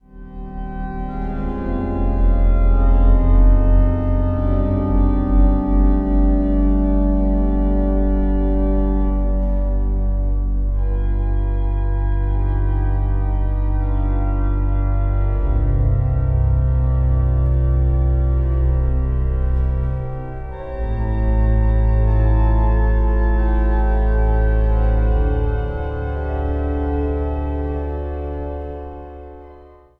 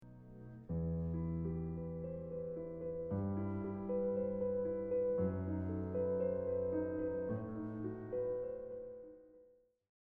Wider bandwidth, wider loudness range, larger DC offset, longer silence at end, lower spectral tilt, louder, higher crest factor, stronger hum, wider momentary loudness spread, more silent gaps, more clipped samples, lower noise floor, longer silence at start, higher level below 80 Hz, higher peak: first, 3.1 kHz vs 2.8 kHz; about the same, 4 LU vs 4 LU; neither; second, 0.45 s vs 0.6 s; about the same, -11.5 dB/octave vs -12 dB/octave; first, -20 LUFS vs -40 LUFS; about the same, 12 dB vs 14 dB; neither; about the same, 9 LU vs 11 LU; neither; neither; second, -43 dBFS vs -68 dBFS; first, 0.15 s vs 0 s; first, -18 dBFS vs -58 dBFS; first, -4 dBFS vs -26 dBFS